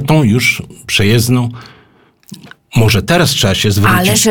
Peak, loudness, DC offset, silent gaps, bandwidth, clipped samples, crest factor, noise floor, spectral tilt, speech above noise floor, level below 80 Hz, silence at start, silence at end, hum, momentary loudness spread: 0 dBFS; -11 LUFS; under 0.1%; none; 19 kHz; under 0.1%; 12 dB; -48 dBFS; -4.5 dB/octave; 37 dB; -36 dBFS; 0 s; 0 s; none; 6 LU